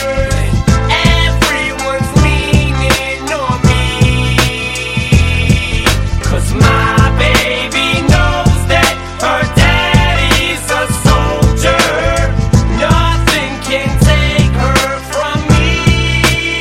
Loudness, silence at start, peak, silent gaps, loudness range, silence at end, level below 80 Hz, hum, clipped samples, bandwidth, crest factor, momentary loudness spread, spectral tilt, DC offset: -11 LUFS; 0 s; 0 dBFS; none; 1 LU; 0 s; -16 dBFS; none; under 0.1%; 16.5 kHz; 10 dB; 5 LU; -4.5 dB/octave; under 0.1%